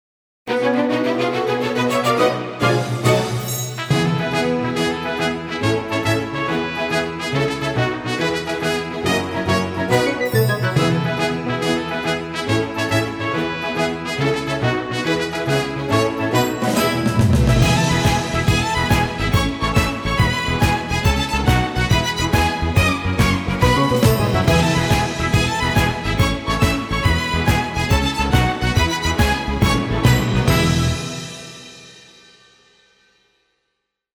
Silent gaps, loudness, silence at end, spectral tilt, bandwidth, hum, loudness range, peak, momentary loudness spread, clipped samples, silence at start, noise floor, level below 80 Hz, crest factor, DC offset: none; -19 LUFS; 2.15 s; -5 dB/octave; 20 kHz; none; 4 LU; -2 dBFS; 6 LU; under 0.1%; 0.45 s; -75 dBFS; -30 dBFS; 16 dB; under 0.1%